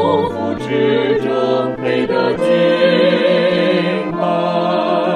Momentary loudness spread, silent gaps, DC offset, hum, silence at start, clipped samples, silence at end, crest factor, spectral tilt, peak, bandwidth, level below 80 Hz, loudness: 6 LU; none; under 0.1%; none; 0 s; under 0.1%; 0 s; 14 dB; -7 dB/octave; 0 dBFS; 10.5 kHz; -52 dBFS; -15 LUFS